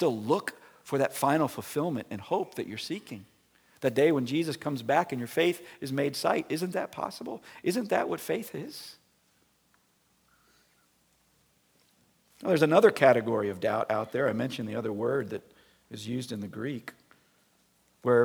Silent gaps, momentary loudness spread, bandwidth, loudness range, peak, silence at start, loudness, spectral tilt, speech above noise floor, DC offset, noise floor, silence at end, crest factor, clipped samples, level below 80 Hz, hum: none; 16 LU; over 20 kHz; 10 LU; -6 dBFS; 0 s; -29 LUFS; -5.5 dB/octave; 40 dB; under 0.1%; -69 dBFS; 0 s; 24 dB; under 0.1%; -76 dBFS; none